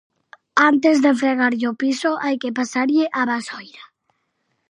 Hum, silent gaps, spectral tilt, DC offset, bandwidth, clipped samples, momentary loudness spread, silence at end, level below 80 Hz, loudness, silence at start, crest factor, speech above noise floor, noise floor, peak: none; none; -3.5 dB/octave; under 0.1%; 11 kHz; under 0.1%; 8 LU; 0.85 s; -76 dBFS; -19 LUFS; 0.55 s; 18 dB; 52 dB; -71 dBFS; -2 dBFS